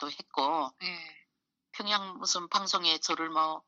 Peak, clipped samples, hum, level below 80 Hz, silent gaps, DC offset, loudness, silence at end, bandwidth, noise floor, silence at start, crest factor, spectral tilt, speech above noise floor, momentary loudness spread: -12 dBFS; under 0.1%; none; -88 dBFS; none; under 0.1%; -30 LUFS; 0.1 s; 8.4 kHz; -81 dBFS; 0 s; 20 dB; -1 dB/octave; 50 dB; 11 LU